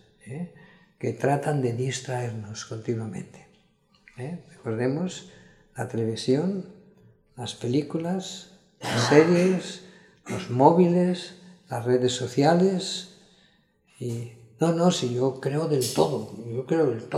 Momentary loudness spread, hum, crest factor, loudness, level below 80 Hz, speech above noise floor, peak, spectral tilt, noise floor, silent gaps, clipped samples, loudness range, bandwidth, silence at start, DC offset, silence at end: 18 LU; none; 24 dB; -25 LUFS; -66 dBFS; 38 dB; -2 dBFS; -6 dB/octave; -63 dBFS; none; under 0.1%; 10 LU; 14.5 kHz; 0.25 s; under 0.1%; 0 s